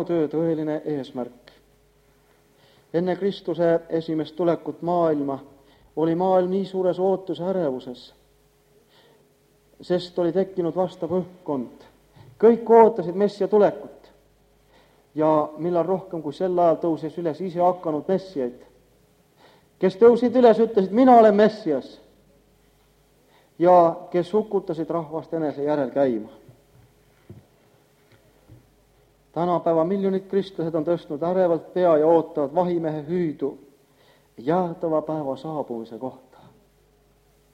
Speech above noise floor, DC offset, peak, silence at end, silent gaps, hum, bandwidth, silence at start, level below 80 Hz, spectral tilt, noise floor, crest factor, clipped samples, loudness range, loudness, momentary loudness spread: 39 dB; under 0.1%; -2 dBFS; 1.4 s; none; none; 9 kHz; 0 s; -64 dBFS; -8.5 dB/octave; -60 dBFS; 22 dB; under 0.1%; 10 LU; -22 LUFS; 14 LU